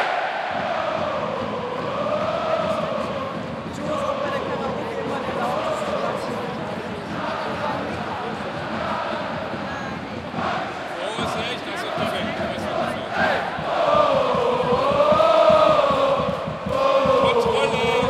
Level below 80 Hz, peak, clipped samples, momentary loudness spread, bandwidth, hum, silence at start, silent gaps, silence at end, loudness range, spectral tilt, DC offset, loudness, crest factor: -52 dBFS; -4 dBFS; under 0.1%; 11 LU; 13.5 kHz; none; 0 s; none; 0 s; 9 LU; -5.5 dB/octave; under 0.1%; -22 LUFS; 18 dB